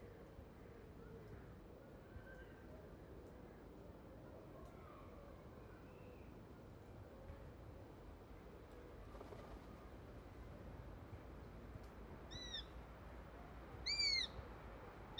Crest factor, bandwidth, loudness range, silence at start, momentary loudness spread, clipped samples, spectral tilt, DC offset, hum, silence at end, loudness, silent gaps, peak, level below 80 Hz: 24 dB; over 20 kHz; 14 LU; 0 s; 11 LU; under 0.1%; -3.5 dB/octave; under 0.1%; none; 0 s; -51 LUFS; none; -30 dBFS; -62 dBFS